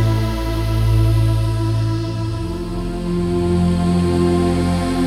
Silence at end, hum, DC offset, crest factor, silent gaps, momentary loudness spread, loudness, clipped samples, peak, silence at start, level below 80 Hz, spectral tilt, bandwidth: 0 s; none; under 0.1%; 10 dB; none; 7 LU; -18 LUFS; under 0.1%; -6 dBFS; 0 s; -26 dBFS; -7.5 dB/octave; 13.5 kHz